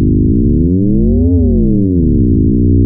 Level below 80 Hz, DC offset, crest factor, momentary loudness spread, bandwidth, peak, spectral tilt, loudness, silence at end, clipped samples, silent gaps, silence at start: -16 dBFS; under 0.1%; 8 dB; 1 LU; 0.9 kHz; -2 dBFS; -18.5 dB/octave; -11 LUFS; 0 s; under 0.1%; none; 0 s